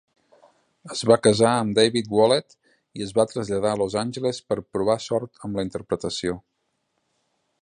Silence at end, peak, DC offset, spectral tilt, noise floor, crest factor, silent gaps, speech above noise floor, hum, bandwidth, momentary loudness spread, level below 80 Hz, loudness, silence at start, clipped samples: 1.25 s; -4 dBFS; under 0.1%; -4.5 dB/octave; -74 dBFS; 20 dB; none; 52 dB; none; 11 kHz; 12 LU; -56 dBFS; -23 LUFS; 0.85 s; under 0.1%